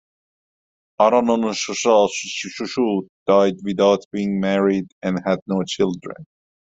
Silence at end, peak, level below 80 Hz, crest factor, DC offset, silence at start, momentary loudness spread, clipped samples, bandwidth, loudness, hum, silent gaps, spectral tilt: 0.45 s; -2 dBFS; -60 dBFS; 18 dB; under 0.1%; 1 s; 10 LU; under 0.1%; 8.2 kHz; -20 LUFS; none; 3.09-3.26 s, 4.05-4.11 s, 4.92-5.02 s, 5.42-5.46 s; -5 dB/octave